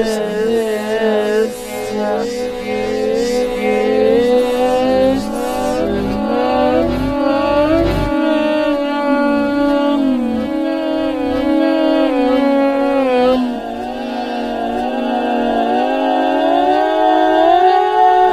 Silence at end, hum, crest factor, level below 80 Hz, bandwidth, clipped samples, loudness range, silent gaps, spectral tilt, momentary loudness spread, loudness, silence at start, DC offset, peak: 0 s; none; 14 dB; -36 dBFS; 15 kHz; under 0.1%; 3 LU; none; -5.5 dB/octave; 8 LU; -15 LUFS; 0 s; under 0.1%; 0 dBFS